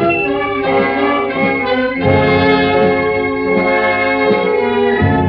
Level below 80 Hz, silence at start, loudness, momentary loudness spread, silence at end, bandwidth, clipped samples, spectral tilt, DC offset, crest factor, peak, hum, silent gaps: -38 dBFS; 0 s; -13 LUFS; 4 LU; 0 s; 5.6 kHz; under 0.1%; -9 dB/octave; under 0.1%; 12 dB; -2 dBFS; none; none